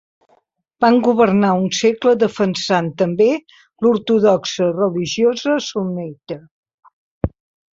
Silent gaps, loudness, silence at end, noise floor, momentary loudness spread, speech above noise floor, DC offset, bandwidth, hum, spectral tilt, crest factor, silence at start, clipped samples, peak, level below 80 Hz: 6.51-6.63 s, 6.74-6.78 s, 6.93-7.21 s; -17 LUFS; 0.45 s; -60 dBFS; 13 LU; 44 dB; under 0.1%; 7.8 kHz; none; -5.5 dB/octave; 16 dB; 0.8 s; under 0.1%; -2 dBFS; -46 dBFS